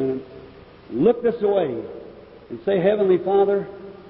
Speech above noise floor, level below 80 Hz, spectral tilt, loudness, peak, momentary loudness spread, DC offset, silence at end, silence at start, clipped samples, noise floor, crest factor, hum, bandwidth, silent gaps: 24 dB; -56 dBFS; -11.5 dB/octave; -21 LUFS; -6 dBFS; 18 LU; under 0.1%; 0 s; 0 s; under 0.1%; -44 dBFS; 16 dB; none; 5.2 kHz; none